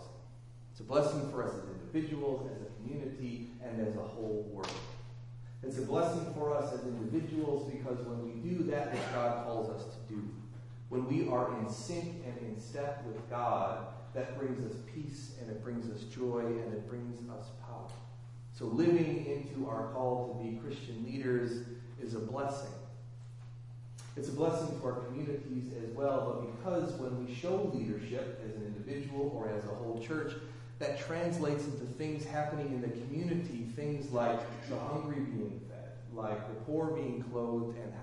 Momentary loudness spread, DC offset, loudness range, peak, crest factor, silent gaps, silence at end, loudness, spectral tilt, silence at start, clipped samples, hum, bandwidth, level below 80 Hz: 13 LU; under 0.1%; 4 LU; -18 dBFS; 20 dB; none; 0 s; -38 LUFS; -7 dB/octave; 0 s; under 0.1%; none; 11.5 kHz; -64 dBFS